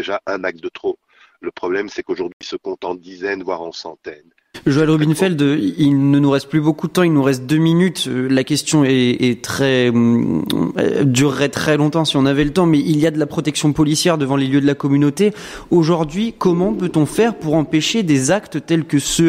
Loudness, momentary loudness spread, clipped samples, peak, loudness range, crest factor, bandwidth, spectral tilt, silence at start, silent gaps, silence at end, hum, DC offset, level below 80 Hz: -16 LUFS; 11 LU; under 0.1%; -4 dBFS; 9 LU; 12 dB; 16 kHz; -5.5 dB/octave; 0 s; 2.33-2.40 s; 0 s; none; under 0.1%; -46 dBFS